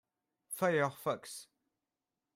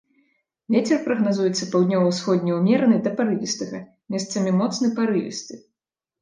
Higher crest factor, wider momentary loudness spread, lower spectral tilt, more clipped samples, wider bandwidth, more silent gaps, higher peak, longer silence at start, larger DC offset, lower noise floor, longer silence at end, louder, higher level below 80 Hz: about the same, 20 dB vs 16 dB; first, 16 LU vs 12 LU; about the same, -4.5 dB/octave vs -5.5 dB/octave; neither; first, 16 kHz vs 9.8 kHz; neither; second, -18 dBFS vs -6 dBFS; second, 0.5 s vs 0.7 s; neither; about the same, -90 dBFS vs -87 dBFS; first, 0.95 s vs 0.65 s; second, -35 LUFS vs -22 LUFS; second, -82 dBFS vs -70 dBFS